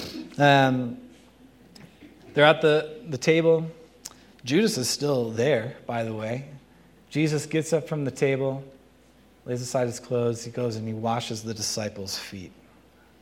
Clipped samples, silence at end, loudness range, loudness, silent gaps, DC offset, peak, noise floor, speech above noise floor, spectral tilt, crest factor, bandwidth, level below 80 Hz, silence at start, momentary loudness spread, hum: under 0.1%; 0.75 s; 6 LU; -25 LUFS; none; under 0.1%; -2 dBFS; -56 dBFS; 32 dB; -5 dB/octave; 24 dB; 16.5 kHz; -64 dBFS; 0 s; 18 LU; none